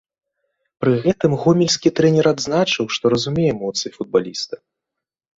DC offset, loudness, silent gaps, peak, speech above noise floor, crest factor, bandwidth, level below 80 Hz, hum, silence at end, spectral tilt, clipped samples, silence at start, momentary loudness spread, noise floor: under 0.1%; -18 LUFS; none; -2 dBFS; 66 dB; 18 dB; 8 kHz; -54 dBFS; none; 0.85 s; -5 dB/octave; under 0.1%; 0.8 s; 9 LU; -84 dBFS